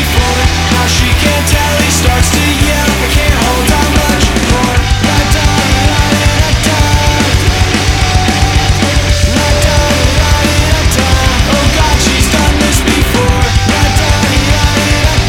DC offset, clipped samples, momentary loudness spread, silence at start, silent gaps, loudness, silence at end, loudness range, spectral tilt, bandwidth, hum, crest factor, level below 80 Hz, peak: 0.2%; under 0.1%; 1 LU; 0 s; none; -9 LUFS; 0 s; 0 LU; -4 dB/octave; 17.5 kHz; none; 8 dB; -14 dBFS; 0 dBFS